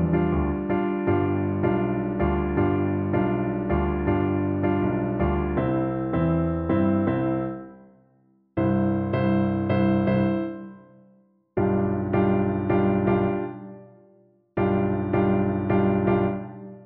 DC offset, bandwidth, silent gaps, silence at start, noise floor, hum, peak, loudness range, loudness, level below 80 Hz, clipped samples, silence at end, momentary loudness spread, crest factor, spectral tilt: under 0.1%; 4.5 kHz; none; 0 s; -62 dBFS; none; -10 dBFS; 1 LU; -24 LUFS; -40 dBFS; under 0.1%; 0 s; 7 LU; 14 dB; -12.5 dB/octave